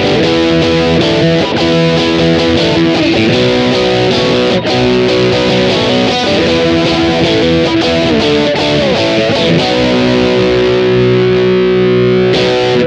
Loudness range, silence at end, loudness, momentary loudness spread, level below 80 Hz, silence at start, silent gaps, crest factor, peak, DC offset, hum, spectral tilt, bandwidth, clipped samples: 0 LU; 0 s; -10 LUFS; 1 LU; -34 dBFS; 0 s; none; 10 dB; 0 dBFS; under 0.1%; none; -5.5 dB/octave; 9.6 kHz; under 0.1%